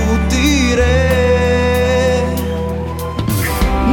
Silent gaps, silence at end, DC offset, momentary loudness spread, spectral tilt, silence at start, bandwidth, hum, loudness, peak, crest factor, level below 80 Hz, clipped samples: none; 0 s; under 0.1%; 8 LU; -5.5 dB/octave; 0 s; 19 kHz; none; -15 LUFS; -2 dBFS; 12 dB; -20 dBFS; under 0.1%